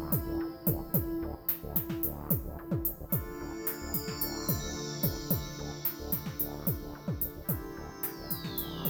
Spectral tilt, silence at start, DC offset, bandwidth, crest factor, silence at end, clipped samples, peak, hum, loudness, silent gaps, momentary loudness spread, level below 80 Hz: -5.5 dB/octave; 0 s; under 0.1%; over 20 kHz; 20 dB; 0 s; under 0.1%; -14 dBFS; none; -33 LUFS; none; 6 LU; -46 dBFS